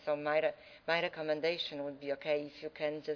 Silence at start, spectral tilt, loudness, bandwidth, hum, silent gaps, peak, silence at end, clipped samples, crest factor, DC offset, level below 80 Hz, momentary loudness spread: 0 s; -5.5 dB/octave; -36 LUFS; 5.4 kHz; none; none; -16 dBFS; 0 s; under 0.1%; 20 dB; under 0.1%; -76 dBFS; 7 LU